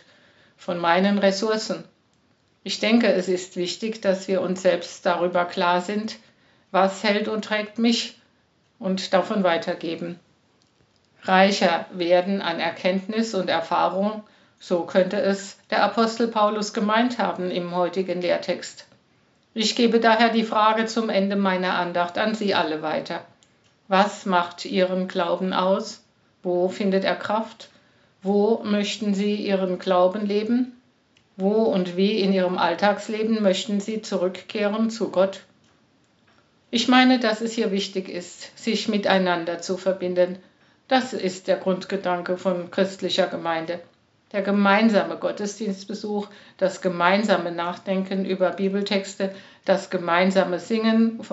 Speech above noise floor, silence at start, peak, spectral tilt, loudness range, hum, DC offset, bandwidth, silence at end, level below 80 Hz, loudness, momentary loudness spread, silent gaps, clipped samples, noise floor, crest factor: 41 dB; 0.6 s; 0 dBFS; -3.5 dB/octave; 3 LU; none; under 0.1%; 8 kHz; 0.05 s; -78 dBFS; -23 LUFS; 10 LU; none; under 0.1%; -64 dBFS; 22 dB